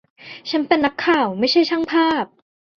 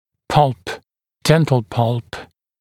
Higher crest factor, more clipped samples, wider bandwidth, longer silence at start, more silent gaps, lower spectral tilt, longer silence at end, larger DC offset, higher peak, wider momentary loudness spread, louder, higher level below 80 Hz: about the same, 18 dB vs 18 dB; neither; second, 6.8 kHz vs 15.5 kHz; about the same, 0.25 s vs 0.3 s; neither; about the same, -5 dB/octave vs -6 dB/octave; first, 0.55 s vs 0.35 s; neither; about the same, -2 dBFS vs 0 dBFS; second, 13 LU vs 19 LU; about the same, -18 LUFS vs -18 LUFS; second, -60 dBFS vs -46 dBFS